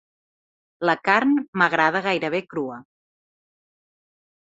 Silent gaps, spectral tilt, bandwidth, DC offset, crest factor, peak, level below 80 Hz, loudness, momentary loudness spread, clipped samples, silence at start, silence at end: 1.48-1.53 s; -5.5 dB/octave; 7.8 kHz; under 0.1%; 22 dB; -2 dBFS; -70 dBFS; -21 LUFS; 12 LU; under 0.1%; 0.8 s; 1.6 s